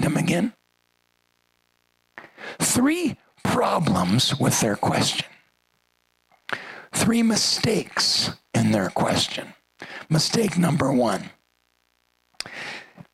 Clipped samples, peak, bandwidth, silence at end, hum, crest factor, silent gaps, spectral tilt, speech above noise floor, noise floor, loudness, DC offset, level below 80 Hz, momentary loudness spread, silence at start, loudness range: under 0.1%; -6 dBFS; 15.5 kHz; 0.1 s; 60 Hz at -45 dBFS; 18 dB; none; -4 dB/octave; 47 dB; -69 dBFS; -22 LUFS; under 0.1%; -56 dBFS; 18 LU; 0 s; 3 LU